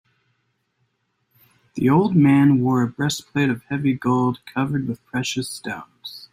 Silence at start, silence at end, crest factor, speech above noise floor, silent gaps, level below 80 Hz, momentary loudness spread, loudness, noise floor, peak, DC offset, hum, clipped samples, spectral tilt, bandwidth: 1.75 s; 0.05 s; 16 dB; 51 dB; none; -58 dBFS; 16 LU; -20 LUFS; -71 dBFS; -6 dBFS; under 0.1%; none; under 0.1%; -6 dB/octave; 15 kHz